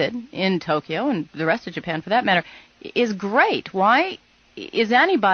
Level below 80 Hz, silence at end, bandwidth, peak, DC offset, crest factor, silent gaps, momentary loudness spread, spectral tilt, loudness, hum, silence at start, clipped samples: -64 dBFS; 0 s; 6.8 kHz; -4 dBFS; under 0.1%; 18 dB; none; 11 LU; -5.5 dB/octave; -21 LUFS; none; 0 s; under 0.1%